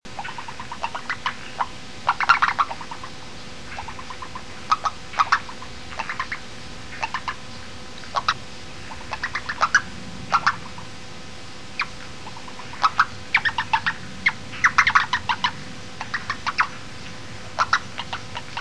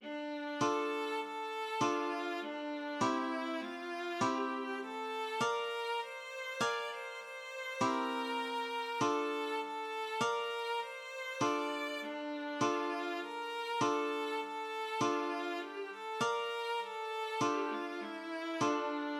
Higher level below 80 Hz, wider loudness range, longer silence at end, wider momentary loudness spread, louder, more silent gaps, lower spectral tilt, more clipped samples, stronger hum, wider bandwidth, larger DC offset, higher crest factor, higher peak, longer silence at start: first, -50 dBFS vs -84 dBFS; first, 7 LU vs 1 LU; about the same, 0 s vs 0 s; first, 17 LU vs 7 LU; first, -24 LUFS vs -37 LUFS; neither; second, -2 dB/octave vs -3.5 dB/octave; neither; neither; second, 11 kHz vs 15.5 kHz; first, 2% vs under 0.1%; first, 24 dB vs 16 dB; first, -2 dBFS vs -20 dBFS; about the same, 0 s vs 0 s